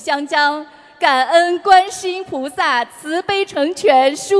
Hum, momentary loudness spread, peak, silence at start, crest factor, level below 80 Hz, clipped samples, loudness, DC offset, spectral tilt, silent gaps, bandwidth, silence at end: none; 11 LU; 0 dBFS; 0 s; 16 dB; -60 dBFS; under 0.1%; -15 LUFS; under 0.1%; -2 dB/octave; none; 11 kHz; 0 s